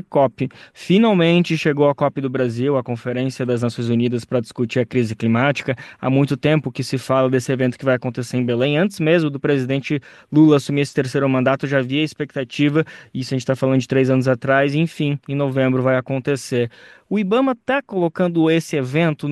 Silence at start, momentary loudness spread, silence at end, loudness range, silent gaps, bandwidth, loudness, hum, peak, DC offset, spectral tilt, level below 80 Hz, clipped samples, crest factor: 0.1 s; 7 LU; 0 s; 2 LU; none; 12.5 kHz; -19 LUFS; none; -2 dBFS; under 0.1%; -7 dB/octave; -60 dBFS; under 0.1%; 16 dB